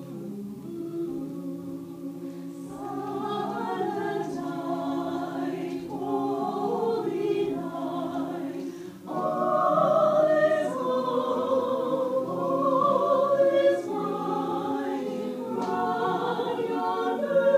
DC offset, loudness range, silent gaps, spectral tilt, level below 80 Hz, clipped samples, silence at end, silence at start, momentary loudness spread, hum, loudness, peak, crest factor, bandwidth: under 0.1%; 8 LU; none; -6.5 dB/octave; -72 dBFS; under 0.1%; 0 s; 0 s; 15 LU; none; -27 LUFS; -10 dBFS; 16 dB; 15.5 kHz